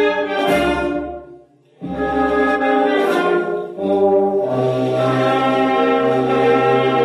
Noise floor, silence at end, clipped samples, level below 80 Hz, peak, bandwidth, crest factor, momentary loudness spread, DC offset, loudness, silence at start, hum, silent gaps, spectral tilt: -45 dBFS; 0 s; under 0.1%; -44 dBFS; -2 dBFS; 14 kHz; 14 dB; 8 LU; under 0.1%; -17 LUFS; 0 s; none; none; -6.5 dB/octave